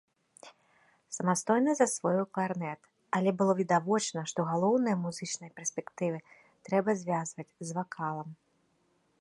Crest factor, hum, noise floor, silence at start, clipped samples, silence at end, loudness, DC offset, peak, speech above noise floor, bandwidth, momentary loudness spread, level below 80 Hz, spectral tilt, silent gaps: 20 dB; none; -72 dBFS; 0.45 s; under 0.1%; 0.85 s; -31 LUFS; under 0.1%; -12 dBFS; 42 dB; 11.5 kHz; 12 LU; -78 dBFS; -5 dB/octave; none